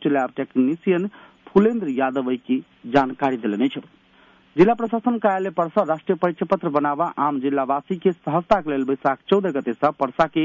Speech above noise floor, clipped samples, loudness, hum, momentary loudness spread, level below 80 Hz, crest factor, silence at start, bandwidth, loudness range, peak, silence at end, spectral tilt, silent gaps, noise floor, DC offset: 33 dB; under 0.1%; -22 LUFS; none; 6 LU; -56 dBFS; 16 dB; 0 s; 7.4 kHz; 1 LU; -6 dBFS; 0 s; -8 dB/octave; none; -54 dBFS; under 0.1%